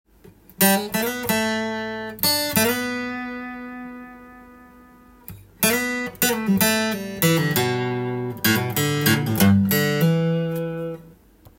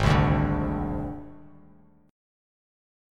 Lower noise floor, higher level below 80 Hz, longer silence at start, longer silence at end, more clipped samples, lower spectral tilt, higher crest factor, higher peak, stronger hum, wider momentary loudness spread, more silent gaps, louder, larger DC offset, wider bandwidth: second, -50 dBFS vs -56 dBFS; second, -56 dBFS vs -36 dBFS; first, 0.6 s vs 0 s; second, 0.45 s vs 1 s; neither; second, -4 dB/octave vs -7.5 dB/octave; about the same, 22 dB vs 20 dB; first, 0 dBFS vs -8 dBFS; second, none vs 50 Hz at -70 dBFS; second, 16 LU vs 19 LU; neither; first, -21 LUFS vs -26 LUFS; neither; first, 17 kHz vs 10 kHz